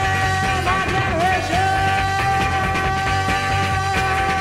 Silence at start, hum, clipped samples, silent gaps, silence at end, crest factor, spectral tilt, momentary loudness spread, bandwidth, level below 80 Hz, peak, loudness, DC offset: 0 s; none; under 0.1%; none; 0 s; 12 dB; -4.5 dB/octave; 1 LU; 15.5 kHz; -32 dBFS; -6 dBFS; -19 LUFS; under 0.1%